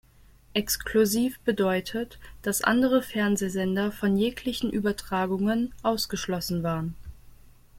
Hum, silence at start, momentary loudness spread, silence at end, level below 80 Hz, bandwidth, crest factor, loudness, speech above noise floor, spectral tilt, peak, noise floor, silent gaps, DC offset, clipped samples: none; 0.55 s; 8 LU; 0 s; -50 dBFS; 16.5 kHz; 20 dB; -27 LUFS; 29 dB; -4.5 dB/octave; -6 dBFS; -55 dBFS; none; under 0.1%; under 0.1%